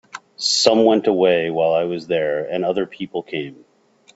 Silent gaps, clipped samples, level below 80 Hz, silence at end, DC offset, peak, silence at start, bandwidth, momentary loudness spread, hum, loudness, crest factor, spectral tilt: none; under 0.1%; -64 dBFS; 0.65 s; under 0.1%; 0 dBFS; 0.15 s; 8.2 kHz; 14 LU; none; -19 LUFS; 20 dB; -3.5 dB/octave